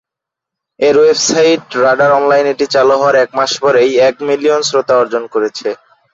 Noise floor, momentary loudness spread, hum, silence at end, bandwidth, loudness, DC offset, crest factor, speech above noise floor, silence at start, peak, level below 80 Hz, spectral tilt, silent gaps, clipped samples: -83 dBFS; 7 LU; none; 0.4 s; 7.8 kHz; -11 LUFS; under 0.1%; 10 dB; 72 dB; 0.8 s; -2 dBFS; -56 dBFS; -3 dB/octave; none; under 0.1%